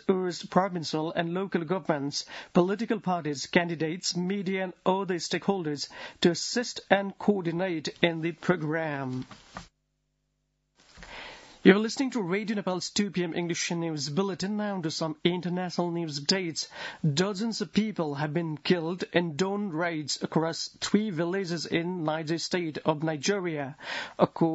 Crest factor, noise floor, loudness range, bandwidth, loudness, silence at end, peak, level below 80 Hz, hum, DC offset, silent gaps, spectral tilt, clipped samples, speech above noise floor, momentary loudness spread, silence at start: 24 dB; -77 dBFS; 2 LU; 8 kHz; -29 LUFS; 0 s; -4 dBFS; -68 dBFS; none; under 0.1%; none; -5 dB/octave; under 0.1%; 48 dB; 7 LU; 0.1 s